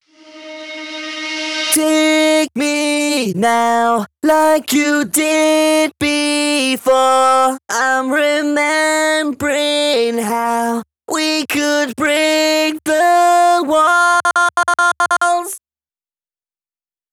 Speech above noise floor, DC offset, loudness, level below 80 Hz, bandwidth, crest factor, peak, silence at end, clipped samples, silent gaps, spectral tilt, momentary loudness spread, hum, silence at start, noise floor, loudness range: over 76 dB; under 0.1%; -14 LUFS; -58 dBFS; over 20 kHz; 14 dB; 0 dBFS; 1.55 s; under 0.1%; none; -2.5 dB/octave; 8 LU; none; 0.35 s; under -90 dBFS; 3 LU